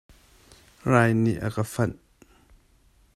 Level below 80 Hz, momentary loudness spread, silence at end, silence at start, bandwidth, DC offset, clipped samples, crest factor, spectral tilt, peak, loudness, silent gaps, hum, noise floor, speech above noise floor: -54 dBFS; 9 LU; 1.25 s; 0.85 s; 13.5 kHz; under 0.1%; under 0.1%; 20 dB; -7 dB/octave; -6 dBFS; -24 LUFS; none; none; -60 dBFS; 37 dB